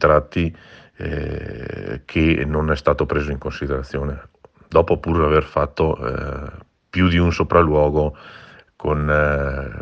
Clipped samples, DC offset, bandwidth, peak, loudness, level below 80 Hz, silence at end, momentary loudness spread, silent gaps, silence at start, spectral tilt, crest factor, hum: under 0.1%; under 0.1%; 7 kHz; 0 dBFS; -20 LUFS; -32 dBFS; 0 s; 13 LU; none; 0 s; -8 dB/octave; 20 dB; none